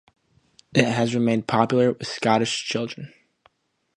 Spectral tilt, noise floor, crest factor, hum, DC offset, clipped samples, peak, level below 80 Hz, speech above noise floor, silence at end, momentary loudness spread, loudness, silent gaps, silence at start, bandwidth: -5 dB/octave; -63 dBFS; 24 dB; none; under 0.1%; under 0.1%; 0 dBFS; -60 dBFS; 41 dB; 0.9 s; 10 LU; -22 LUFS; none; 0.75 s; 10.5 kHz